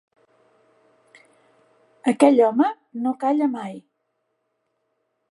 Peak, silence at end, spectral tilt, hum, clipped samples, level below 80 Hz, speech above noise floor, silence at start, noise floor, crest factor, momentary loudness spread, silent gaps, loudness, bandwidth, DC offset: -2 dBFS; 1.5 s; -5.5 dB/octave; none; under 0.1%; -82 dBFS; 55 dB; 2.05 s; -74 dBFS; 22 dB; 17 LU; none; -20 LUFS; 11.5 kHz; under 0.1%